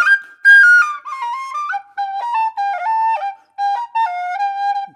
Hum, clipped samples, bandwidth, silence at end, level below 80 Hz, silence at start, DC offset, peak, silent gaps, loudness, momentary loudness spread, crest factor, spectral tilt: none; under 0.1%; 12 kHz; 0.05 s; -88 dBFS; 0 s; under 0.1%; -2 dBFS; none; -15 LUFS; 16 LU; 14 dB; 2 dB/octave